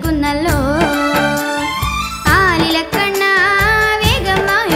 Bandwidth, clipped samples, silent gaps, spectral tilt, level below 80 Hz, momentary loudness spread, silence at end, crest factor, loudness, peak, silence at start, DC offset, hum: 16 kHz; under 0.1%; none; -4 dB/octave; -28 dBFS; 6 LU; 0 s; 14 dB; -13 LUFS; 0 dBFS; 0 s; under 0.1%; none